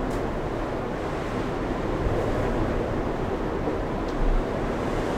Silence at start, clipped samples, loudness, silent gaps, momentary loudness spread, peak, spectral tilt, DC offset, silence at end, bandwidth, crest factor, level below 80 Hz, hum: 0 s; under 0.1%; -28 LUFS; none; 3 LU; -12 dBFS; -7 dB/octave; under 0.1%; 0 s; 12 kHz; 14 dB; -32 dBFS; none